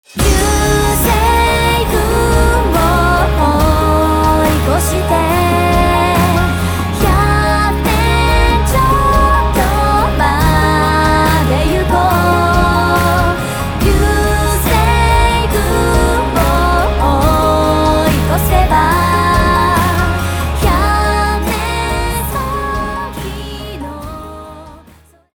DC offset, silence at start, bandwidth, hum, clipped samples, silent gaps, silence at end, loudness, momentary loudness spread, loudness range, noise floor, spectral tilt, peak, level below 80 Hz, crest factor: under 0.1%; 0.15 s; over 20 kHz; none; under 0.1%; none; 0.6 s; -12 LUFS; 6 LU; 4 LU; -44 dBFS; -5 dB/octave; 0 dBFS; -18 dBFS; 12 dB